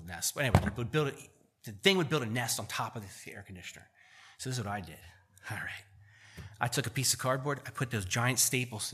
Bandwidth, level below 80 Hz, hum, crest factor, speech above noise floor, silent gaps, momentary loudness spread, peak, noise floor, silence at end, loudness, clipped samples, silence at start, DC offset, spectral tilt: 15 kHz; -54 dBFS; none; 26 dB; 22 dB; none; 20 LU; -8 dBFS; -55 dBFS; 0 s; -32 LUFS; under 0.1%; 0 s; under 0.1%; -3.5 dB/octave